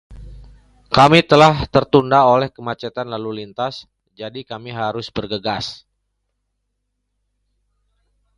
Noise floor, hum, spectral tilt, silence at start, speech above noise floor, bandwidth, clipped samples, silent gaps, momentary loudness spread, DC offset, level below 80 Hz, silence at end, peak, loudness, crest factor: -73 dBFS; 50 Hz at -55 dBFS; -6 dB/octave; 0.1 s; 57 dB; 11.5 kHz; under 0.1%; none; 19 LU; under 0.1%; -44 dBFS; 2.6 s; 0 dBFS; -16 LUFS; 20 dB